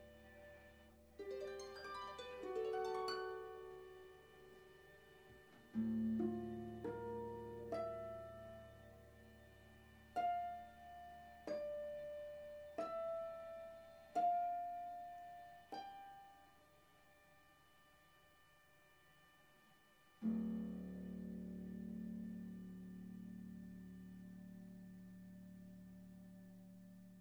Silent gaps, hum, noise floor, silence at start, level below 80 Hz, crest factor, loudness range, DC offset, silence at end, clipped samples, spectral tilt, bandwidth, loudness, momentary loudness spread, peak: none; none; -71 dBFS; 0 s; -72 dBFS; 18 dB; 13 LU; under 0.1%; 0 s; under 0.1%; -6.5 dB/octave; over 20 kHz; -48 LUFS; 25 LU; -30 dBFS